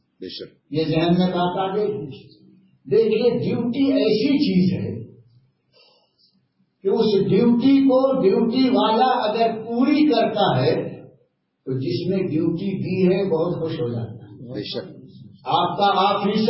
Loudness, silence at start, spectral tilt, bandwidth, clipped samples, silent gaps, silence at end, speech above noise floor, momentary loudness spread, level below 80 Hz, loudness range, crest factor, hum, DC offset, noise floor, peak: -20 LUFS; 0.2 s; -11 dB/octave; 5.8 kHz; under 0.1%; none; 0 s; 46 dB; 14 LU; -56 dBFS; 6 LU; 14 dB; none; under 0.1%; -65 dBFS; -6 dBFS